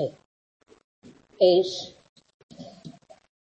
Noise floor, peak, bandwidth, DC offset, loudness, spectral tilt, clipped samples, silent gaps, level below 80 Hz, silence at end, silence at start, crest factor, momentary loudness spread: -48 dBFS; -8 dBFS; 8.4 kHz; under 0.1%; -23 LUFS; -5.5 dB/octave; under 0.1%; 0.25-0.60 s, 0.84-1.02 s, 2.09-2.16 s, 2.34-2.49 s; -74 dBFS; 0.55 s; 0 s; 22 dB; 27 LU